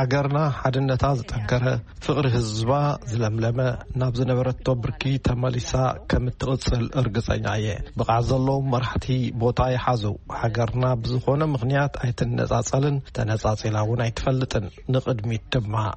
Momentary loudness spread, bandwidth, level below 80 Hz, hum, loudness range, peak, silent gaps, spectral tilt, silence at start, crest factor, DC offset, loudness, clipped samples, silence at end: 4 LU; 8.4 kHz; -38 dBFS; none; 1 LU; -6 dBFS; none; -6.5 dB/octave; 0 s; 16 dB; under 0.1%; -24 LUFS; under 0.1%; 0 s